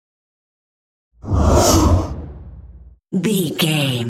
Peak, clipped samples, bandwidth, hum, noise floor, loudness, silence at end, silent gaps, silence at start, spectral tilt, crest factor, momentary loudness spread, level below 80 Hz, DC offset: -2 dBFS; under 0.1%; 16 kHz; none; -41 dBFS; -17 LUFS; 0 s; none; 1.25 s; -5 dB/octave; 16 dB; 22 LU; -28 dBFS; under 0.1%